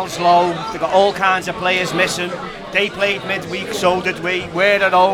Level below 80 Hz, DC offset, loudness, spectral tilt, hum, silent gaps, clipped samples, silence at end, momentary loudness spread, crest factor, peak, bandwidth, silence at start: -48 dBFS; under 0.1%; -17 LUFS; -3.5 dB/octave; none; none; under 0.1%; 0 s; 8 LU; 16 dB; 0 dBFS; 17 kHz; 0 s